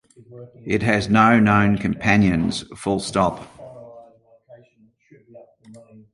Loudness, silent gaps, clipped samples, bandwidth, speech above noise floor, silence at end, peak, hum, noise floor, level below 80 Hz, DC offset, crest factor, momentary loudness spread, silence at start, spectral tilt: -19 LUFS; none; under 0.1%; 11.5 kHz; 38 dB; 0.35 s; -2 dBFS; none; -57 dBFS; -46 dBFS; under 0.1%; 20 dB; 23 LU; 0.3 s; -6 dB/octave